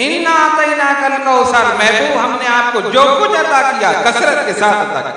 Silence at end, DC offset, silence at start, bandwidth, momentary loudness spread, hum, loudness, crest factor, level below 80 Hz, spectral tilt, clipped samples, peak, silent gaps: 0 s; under 0.1%; 0 s; 10.5 kHz; 3 LU; none; -11 LUFS; 12 dB; -56 dBFS; -2.5 dB/octave; under 0.1%; 0 dBFS; none